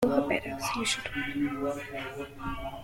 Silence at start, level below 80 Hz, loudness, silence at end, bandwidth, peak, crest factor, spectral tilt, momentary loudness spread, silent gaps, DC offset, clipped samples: 0 s; -50 dBFS; -32 LUFS; 0 s; 16.5 kHz; -12 dBFS; 20 dB; -3.5 dB/octave; 9 LU; none; under 0.1%; under 0.1%